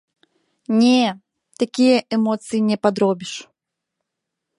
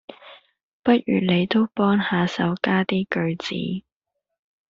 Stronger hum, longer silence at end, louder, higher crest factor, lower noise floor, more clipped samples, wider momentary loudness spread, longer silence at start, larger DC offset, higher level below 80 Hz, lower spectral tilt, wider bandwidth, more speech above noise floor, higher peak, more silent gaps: neither; first, 1.15 s vs 0.9 s; first, -19 LUFS vs -22 LUFS; about the same, 18 dB vs 20 dB; about the same, -81 dBFS vs -81 dBFS; neither; first, 16 LU vs 8 LU; first, 0.7 s vs 0.1 s; neither; second, -70 dBFS vs -60 dBFS; about the same, -5 dB/octave vs -5 dB/octave; first, 11.5 kHz vs 7.4 kHz; about the same, 63 dB vs 60 dB; about the same, -2 dBFS vs -4 dBFS; second, none vs 0.63-0.80 s